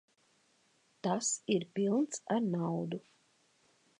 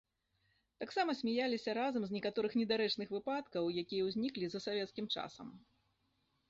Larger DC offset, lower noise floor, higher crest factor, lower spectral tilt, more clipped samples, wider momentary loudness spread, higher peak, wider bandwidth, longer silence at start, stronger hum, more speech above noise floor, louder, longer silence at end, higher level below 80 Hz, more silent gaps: neither; second, -72 dBFS vs -80 dBFS; about the same, 18 dB vs 18 dB; first, -5 dB/octave vs -3 dB/octave; neither; about the same, 8 LU vs 6 LU; first, -18 dBFS vs -22 dBFS; first, 11 kHz vs 7.6 kHz; first, 1.05 s vs 0.8 s; neither; second, 38 dB vs 42 dB; first, -34 LUFS vs -38 LUFS; about the same, 1 s vs 0.9 s; second, -86 dBFS vs -76 dBFS; neither